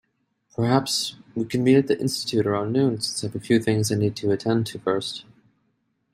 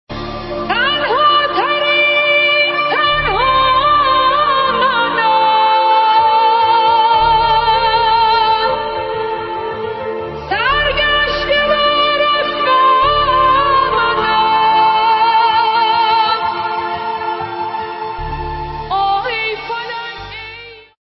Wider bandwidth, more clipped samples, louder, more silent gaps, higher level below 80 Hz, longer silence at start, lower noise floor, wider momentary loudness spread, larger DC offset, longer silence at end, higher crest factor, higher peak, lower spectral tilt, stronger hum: first, 16 kHz vs 6 kHz; neither; second, -23 LUFS vs -13 LUFS; neither; second, -62 dBFS vs -36 dBFS; first, 0.6 s vs 0.1 s; first, -71 dBFS vs -34 dBFS; about the same, 10 LU vs 12 LU; neither; first, 0.9 s vs 0.25 s; first, 20 dB vs 12 dB; about the same, -4 dBFS vs -2 dBFS; about the same, -5.5 dB/octave vs -6 dB/octave; neither